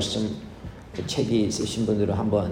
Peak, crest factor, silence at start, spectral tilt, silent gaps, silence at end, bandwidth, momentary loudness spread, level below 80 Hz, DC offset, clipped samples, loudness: -10 dBFS; 16 dB; 0 s; -5.5 dB/octave; none; 0 s; 15.5 kHz; 14 LU; -48 dBFS; under 0.1%; under 0.1%; -25 LUFS